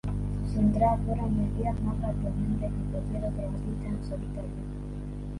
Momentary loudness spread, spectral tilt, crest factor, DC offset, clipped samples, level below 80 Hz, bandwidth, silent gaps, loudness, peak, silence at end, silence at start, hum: 12 LU; -9.5 dB/octave; 18 dB; under 0.1%; under 0.1%; -36 dBFS; 11.5 kHz; none; -31 LUFS; -12 dBFS; 0 s; 0.05 s; 50 Hz at -35 dBFS